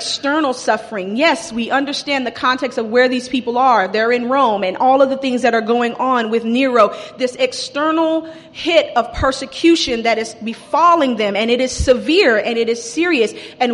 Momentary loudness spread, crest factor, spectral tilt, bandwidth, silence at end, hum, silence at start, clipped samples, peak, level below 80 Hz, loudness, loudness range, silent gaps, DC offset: 7 LU; 14 dB; -3.5 dB/octave; 11.5 kHz; 0 s; none; 0 s; under 0.1%; 0 dBFS; -40 dBFS; -16 LUFS; 2 LU; none; under 0.1%